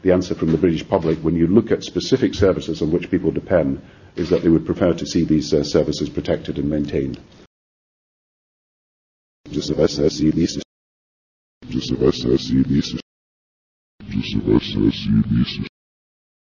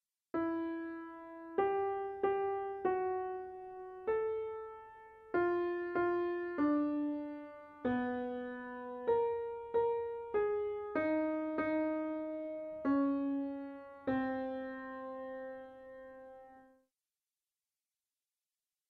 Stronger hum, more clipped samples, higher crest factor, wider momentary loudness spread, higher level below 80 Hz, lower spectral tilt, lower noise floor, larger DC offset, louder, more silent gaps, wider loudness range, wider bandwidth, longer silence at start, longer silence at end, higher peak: neither; neither; about the same, 18 dB vs 16 dB; second, 11 LU vs 15 LU; first, -38 dBFS vs -72 dBFS; second, -6.5 dB/octave vs -8.5 dB/octave; about the same, under -90 dBFS vs under -90 dBFS; neither; first, -20 LUFS vs -37 LUFS; first, 7.47-9.44 s, 10.65-11.61 s, 13.02-13.99 s vs none; about the same, 7 LU vs 7 LU; first, 7.4 kHz vs 5 kHz; second, 0.05 s vs 0.35 s; second, 0.9 s vs 2.25 s; first, -2 dBFS vs -22 dBFS